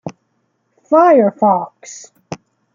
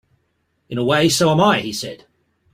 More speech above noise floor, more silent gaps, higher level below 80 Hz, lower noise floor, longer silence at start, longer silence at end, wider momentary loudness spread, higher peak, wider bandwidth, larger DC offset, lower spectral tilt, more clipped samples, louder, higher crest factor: about the same, 53 dB vs 51 dB; neither; second, -66 dBFS vs -54 dBFS; about the same, -65 dBFS vs -68 dBFS; second, 0.05 s vs 0.7 s; second, 0.4 s vs 0.6 s; first, 24 LU vs 14 LU; about the same, -2 dBFS vs -2 dBFS; second, 7.6 kHz vs 16 kHz; neither; first, -6.5 dB/octave vs -4.5 dB/octave; neither; first, -12 LUFS vs -17 LUFS; about the same, 14 dB vs 18 dB